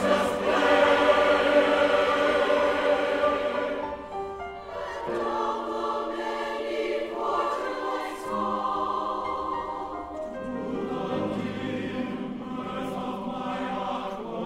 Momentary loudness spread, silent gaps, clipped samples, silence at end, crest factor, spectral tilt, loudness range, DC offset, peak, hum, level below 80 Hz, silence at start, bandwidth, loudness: 13 LU; none; under 0.1%; 0 s; 18 dB; -5 dB/octave; 10 LU; under 0.1%; -8 dBFS; none; -54 dBFS; 0 s; 13.5 kHz; -27 LUFS